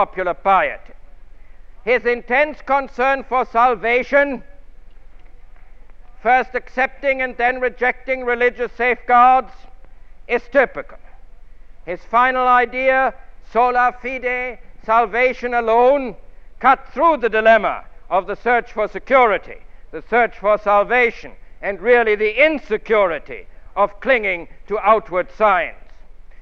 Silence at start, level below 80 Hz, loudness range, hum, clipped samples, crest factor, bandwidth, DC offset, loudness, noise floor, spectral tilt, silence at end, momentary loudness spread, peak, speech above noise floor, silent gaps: 0 s; -42 dBFS; 3 LU; none; under 0.1%; 18 dB; 6.8 kHz; under 0.1%; -17 LUFS; -37 dBFS; -5.5 dB/octave; 0 s; 12 LU; 0 dBFS; 19 dB; none